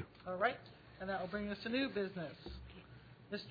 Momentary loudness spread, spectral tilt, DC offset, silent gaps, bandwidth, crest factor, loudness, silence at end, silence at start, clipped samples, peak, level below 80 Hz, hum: 19 LU; -3.5 dB/octave; under 0.1%; none; 5.2 kHz; 20 dB; -41 LUFS; 0 s; 0 s; under 0.1%; -22 dBFS; -62 dBFS; none